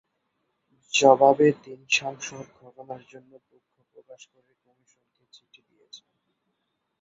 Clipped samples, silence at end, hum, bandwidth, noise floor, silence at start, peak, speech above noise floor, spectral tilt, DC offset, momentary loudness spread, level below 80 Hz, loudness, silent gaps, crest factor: under 0.1%; 4.05 s; none; 8 kHz; -78 dBFS; 0.95 s; -2 dBFS; 53 dB; -3.5 dB/octave; under 0.1%; 25 LU; -74 dBFS; -20 LUFS; none; 24 dB